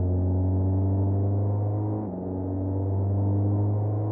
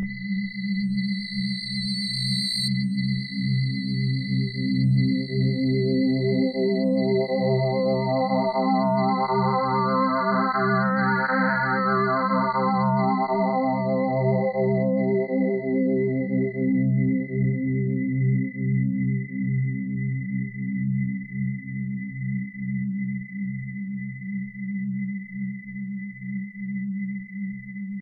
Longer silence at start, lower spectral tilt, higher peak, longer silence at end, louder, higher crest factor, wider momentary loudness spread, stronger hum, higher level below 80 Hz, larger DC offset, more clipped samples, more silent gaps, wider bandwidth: about the same, 0 s vs 0 s; first, -13 dB/octave vs -7 dB/octave; second, -16 dBFS vs -12 dBFS; about the same, 0 s vs 0 s; about the same, -26 LUFS vs -25 LUFS; about the same, 8 dB vs 12 dB; second, 5 LU vs 10 LU; neither; first, -48 dBFS vs -60 dBFS; neither; neither; neither; second, 1.6 kHz vs 9.4 kHz